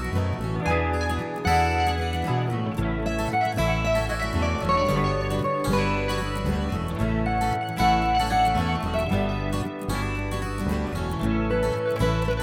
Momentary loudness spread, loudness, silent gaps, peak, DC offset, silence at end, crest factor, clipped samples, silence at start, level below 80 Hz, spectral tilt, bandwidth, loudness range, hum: 6 LU; -25 LUFS; none; -8 dBFS; under 0.1%; 0 s; 16 dB; under 0.1%; 0 s; -34 dBFS; -6 dB/octave; 17 kHz; 2 LU; none